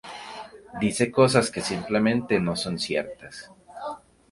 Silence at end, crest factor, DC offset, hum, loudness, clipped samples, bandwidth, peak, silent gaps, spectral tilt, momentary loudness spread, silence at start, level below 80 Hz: 0.35 s; 22 dB; under 0.1%; none; -24 LUFS; under 0.1%; 11.5 kHz; -4 dBFS; none; -5 dB/octave; 21 LU; 0.05 s; -56 dBFS